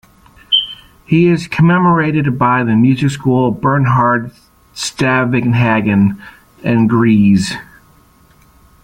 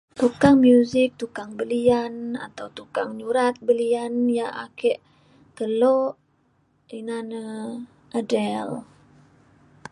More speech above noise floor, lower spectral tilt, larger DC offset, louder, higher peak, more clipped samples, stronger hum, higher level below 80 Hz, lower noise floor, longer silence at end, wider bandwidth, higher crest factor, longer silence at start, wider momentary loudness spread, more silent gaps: second, 36 dB vs 43 dB; about the same, -6 dB/octave vs -6 dB/octave; neither; first, -13 LUFS vs -23 LUFS; about the same, -2 dBFS vs -4 dBFS; neither; neither; first, -46 dBFS vs -58 dBFS; second, -48 dBFS vs -65 dBFS; about the same, 1.2 s vs 1.1 s; first, 14 kHz vs 11 kHz; second, 12 dB vs 20 dB; first, 0.5 s vs 0.15 s; second, 12 LU vs 17 LU; neither